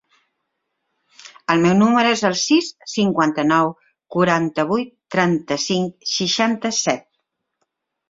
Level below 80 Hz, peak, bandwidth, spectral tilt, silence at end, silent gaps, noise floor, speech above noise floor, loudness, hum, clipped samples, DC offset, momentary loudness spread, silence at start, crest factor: -60 dBFS; -2 dBFS; 7.8 kHz; -4 dB/octave; 1.1 s; none; -75 dBFS; 57 dB; -19 LUFS; none; under 0.1%; under 0.1%; 9 LU; 1.25 s; 18 dB